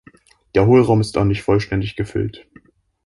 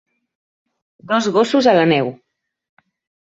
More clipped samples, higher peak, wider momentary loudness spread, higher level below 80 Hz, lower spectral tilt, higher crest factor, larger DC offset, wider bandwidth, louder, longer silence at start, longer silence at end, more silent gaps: neither; about the same, -2 dBFS vs -2 dBFS; first, 11 LU vs 7 LU; first, -40 dBFS vs -64 dBFS; first, -7.5 dB/octave vs -5.5 dB/octave; about the same, 16 dB vs 18 dB; neither; first, 11.5 kHz vs 8 kHz; about the same, -18 LUFS vs -16 LUFS; second, 0.55 s vs 1.05 s; second, 0.7 s vs 1.1 s; neither